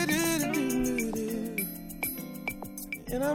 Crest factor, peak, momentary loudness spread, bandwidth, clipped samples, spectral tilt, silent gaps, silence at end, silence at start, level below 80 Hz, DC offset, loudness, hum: 18 dB; -14 dBFS; 10 LU; 19 kHz; under 0.1%; -4 dB/octave; none; 0 s; 0 s; -50 dBFS; under 0.1%; -31 LUFS; none